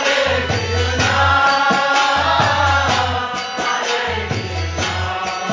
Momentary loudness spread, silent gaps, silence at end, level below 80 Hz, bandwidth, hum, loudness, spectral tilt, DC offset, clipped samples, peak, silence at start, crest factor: 8 LU; none; 0 s; -30 dBFS; 7.6 kHz; none; -16 LUFS; -3.5 dB/octave; under 0.1%; under 0.1%; -2 dBFS; 0 s; 14 dB